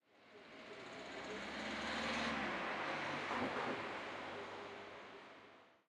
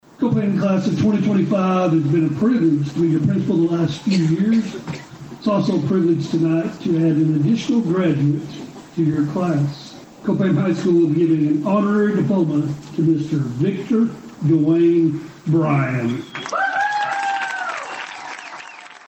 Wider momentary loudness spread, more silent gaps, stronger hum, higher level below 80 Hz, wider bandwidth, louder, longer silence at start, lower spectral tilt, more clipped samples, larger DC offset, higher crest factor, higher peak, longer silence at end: first, 18 LU vs 11 LU; neither; neither; second, -72 dBFS vs -56 dBFS; first, 12.5 kHz vs 8.4 kHz; second, -43 LUFS vs -19 LUFS; about the same, 0.15 s vs 0.2 s; second, -3.5 dB/octave vs -7.5 dB/octave; neither; neither; about the same, 16 dB vs 12 dB; second, -28 dBFS vs -6 dBFS; about the same, 0.1 s vs 0.1 s